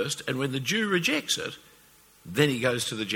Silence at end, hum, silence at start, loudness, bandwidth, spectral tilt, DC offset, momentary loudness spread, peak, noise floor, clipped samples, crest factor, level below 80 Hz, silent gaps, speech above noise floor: 0 s; none; 0 s; -26 LUFS; 19.5 kHz; -3.5 dB/octave; under 0.1%; 9 LU; -6 dBFS; -57 dBFS; under 0.1%; 22 dB; -64 dBFS; none; 30 dB